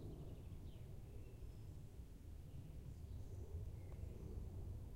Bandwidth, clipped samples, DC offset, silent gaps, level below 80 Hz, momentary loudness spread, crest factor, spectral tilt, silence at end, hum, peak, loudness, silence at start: 16 kHz; under 0.1%; under 0.1%; none; -56 dBFS; 5 LU; 14 dB; -7.5 dB/octave; 0 s; none; -38 dBFS; -55 LUFS; 0 s